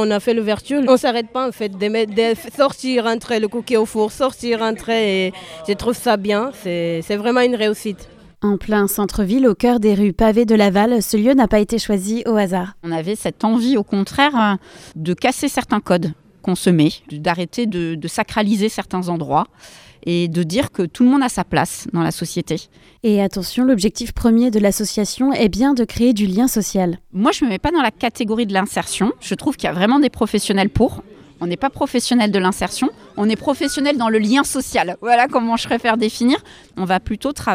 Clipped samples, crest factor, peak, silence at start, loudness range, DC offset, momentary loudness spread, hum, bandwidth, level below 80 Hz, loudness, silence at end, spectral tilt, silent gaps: under 0.1%; 16 dB; 0 dBFS; 0 s; 4 LU; under 0.1%; 8 LU; none; 16.5 kHz; -42 dBFS; -18 LUFS; 0 s; -5 dB/octave; none